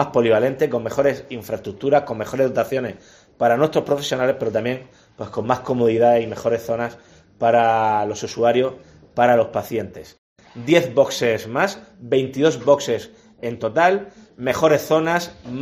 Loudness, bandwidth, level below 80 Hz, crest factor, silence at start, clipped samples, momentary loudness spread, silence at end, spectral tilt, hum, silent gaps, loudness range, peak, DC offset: -20 LUFS; 15.5 kHz; -56 dBFS; 18 dB; 0 s; under 0.1%; 13 LU; 0 s; -5.5 dB/octave; none; 10.18-10.36 s; 2 LU; 0 dBFS; under 0.1%